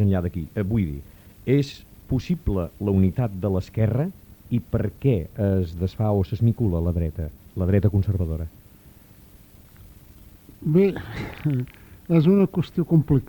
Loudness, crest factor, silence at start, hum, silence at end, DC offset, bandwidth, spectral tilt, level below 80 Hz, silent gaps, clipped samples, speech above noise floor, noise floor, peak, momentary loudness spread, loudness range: -24 LUFS; 18 dB; 0 s; none; 0 s; under 0.1%; 19 kHz; -9.5 dB/octave; -40 dBFS; none; under 0.1%; 27 dB; -49 dBFS; -6 dBFS; 12 LU; 4 LU